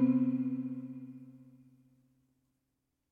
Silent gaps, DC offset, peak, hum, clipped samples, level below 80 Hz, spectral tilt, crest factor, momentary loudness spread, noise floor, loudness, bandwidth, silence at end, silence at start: none; under 0.1%; -18 dBFS; none; under 0.1%; -86 dBFS; -11 dB/octave; 18 dB; 22 LU; -83 dBFS; -34 LUFS; 2.8 kHz; 1.7 s; 0 s